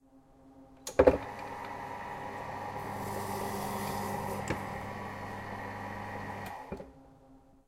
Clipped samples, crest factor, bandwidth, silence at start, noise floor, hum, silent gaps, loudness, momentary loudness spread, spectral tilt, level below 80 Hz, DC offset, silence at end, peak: under 0.1%; 28 dB; 16 kHz; 0.15 s; -59 dBFS; none; none; -35 LUFS; 14 LU; -5.5 dB/octave; -52 dBFS; under 0.1%; 0.3 s; -8 dBFS